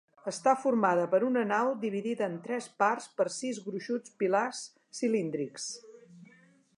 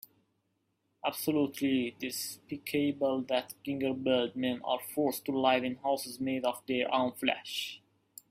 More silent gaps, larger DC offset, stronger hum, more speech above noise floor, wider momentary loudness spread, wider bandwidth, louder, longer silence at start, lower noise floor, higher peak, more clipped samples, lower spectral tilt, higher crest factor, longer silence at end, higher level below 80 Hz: neither; neither; neither; second, 30 dB vs 46 dB; first, 12 LU vs 7 LU; second, 11.5 kHz vs 16 kHz; about the same, -31 LUFS vs -32 LUFS; second, 0.25 s vs 1.05 s; second, -61 dBFS vs -78 dBFS; about the same, -12 dBFS vs -12 dBFS; neither; about the same, -4.5 dB/octave vs -4 dB/octave; about the same, 20 dB vs 22 dB; about the same, 0.55 s vs 0.55 s; second, -86 dBFS vs -74 dBFS